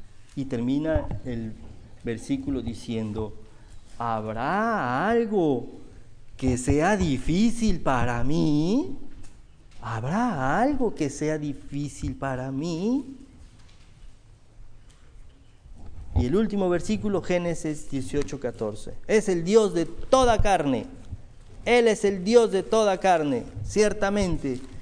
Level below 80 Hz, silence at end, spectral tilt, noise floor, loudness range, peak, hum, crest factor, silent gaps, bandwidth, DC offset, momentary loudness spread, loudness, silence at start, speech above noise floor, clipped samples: -38 dBFS; 0 s; -6 dB/octave; -49 dBFS; 9 LU; -4 dBFS; none; 20 dB; none; 10.5 kHz; under 0.1%; 13 LU; -25 LUFS; 0 s; 25 dB; under 0.1%